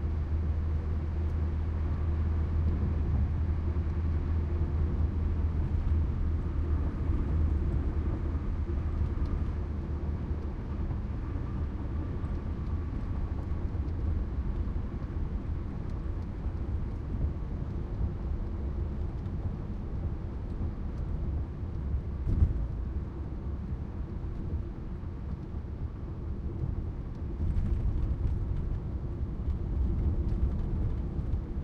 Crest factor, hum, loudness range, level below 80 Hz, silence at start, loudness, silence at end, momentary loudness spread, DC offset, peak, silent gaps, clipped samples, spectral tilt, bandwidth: 18 dB; none; 5 LU; -34 dBFS; 0 s; -34 LUFS; 0 s; 7 LU; under 0.1%; -14 dBFS; none; under 0.1%; -10 dB/octave; 4.8 kHz